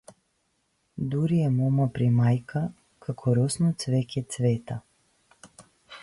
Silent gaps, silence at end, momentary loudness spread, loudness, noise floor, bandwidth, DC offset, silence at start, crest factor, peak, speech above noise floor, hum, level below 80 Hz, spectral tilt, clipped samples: none; 0.05 s; 13 LU; -26 LUFS; -73 dBFS; 11.5 kHz; under 0.1%; 0.95 s; 14 dB; -12 dBFS; 48 dB; none; -58 dBFS; -7 dB/octave; under 0.1%